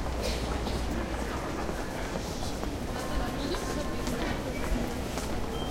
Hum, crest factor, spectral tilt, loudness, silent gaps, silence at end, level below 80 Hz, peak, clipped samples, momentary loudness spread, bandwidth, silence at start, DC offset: none; 16 dB; -5 dB/octave; -33 LUFS; none; 0 s; -36 dBFS; -16 dBFS; under 0.1%; 2 LU; 16 kHz; 0 s; under 0.1%